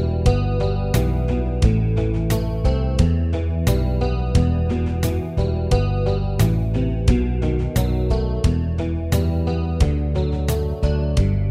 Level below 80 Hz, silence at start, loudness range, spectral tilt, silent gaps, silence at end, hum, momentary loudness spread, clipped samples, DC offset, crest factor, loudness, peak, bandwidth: -22 dBFS; 0 s; 1 LU; -7.5 dB/octave; none; 0 s; none; 3 LU; under 0.1%; under 0.1%; 16 dB; -21 LUFS; -2 dBFS; 16 kHz